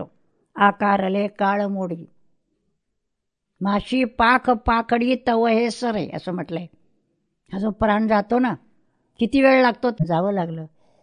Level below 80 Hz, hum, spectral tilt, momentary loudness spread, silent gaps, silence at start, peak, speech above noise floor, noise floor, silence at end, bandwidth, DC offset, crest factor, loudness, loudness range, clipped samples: -46 dBFS; none; -6.5 dB/octave; 14 LU; none; 0 s; -2 dBFS; 59 dB; -79 dBFS; 0.35 s; 10.5 kHz; under 0.1%; 18 dB; -20 LUFS; 4 LU; under 0.1%